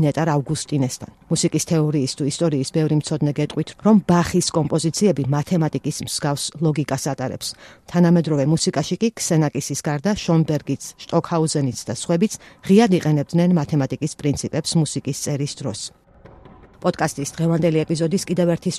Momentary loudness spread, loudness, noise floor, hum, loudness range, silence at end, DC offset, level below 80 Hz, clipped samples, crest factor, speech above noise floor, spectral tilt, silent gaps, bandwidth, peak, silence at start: 8 LU; -20 LUFS; -46 dBFS; none; 4 LU; 0 s; under 0.1%; -50 dBFS; under 0.1%; 18 dB; 26 dB; -5.5 dB/octave; none; 14 kHz; -2 dBFS; 0 s